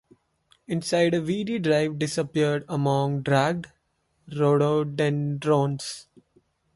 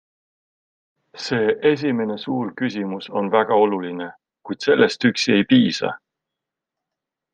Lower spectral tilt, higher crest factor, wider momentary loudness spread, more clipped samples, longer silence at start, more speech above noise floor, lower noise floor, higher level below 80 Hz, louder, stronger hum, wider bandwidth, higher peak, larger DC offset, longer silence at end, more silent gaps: about the same, -6 dB/octave vs -5.5 dB/octave; about the same, 18 dB vs 20 dB; second, 10 LU vs 14 LU; neither; second, 0.7 s vs 1.15 s; second, 47 dB vs 65 dB; second, -71 dBFS vs -84 dBFS; about the same, -62 dBFS vs -66 dBFS; second, -25 LUFS vs -20 LUFS; neither; first, 11.5 kHz vs 9.4 kHz; second, -8 dBFS vs -2 dBFS; neither; second, 0.75 s vs 1.4 s; neither